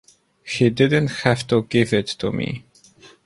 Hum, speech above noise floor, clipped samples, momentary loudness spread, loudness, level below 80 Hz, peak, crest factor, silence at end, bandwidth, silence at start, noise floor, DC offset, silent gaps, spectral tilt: none; 30 dB; under 0.1%; 11 LU; -20 LUFS; -52 dBFS; -2 dBFS; 18 dB; 0.2 s; 11.5 kHz; 0.45 s; -50 dBFS; under 0.1%; none; -6 dB/octave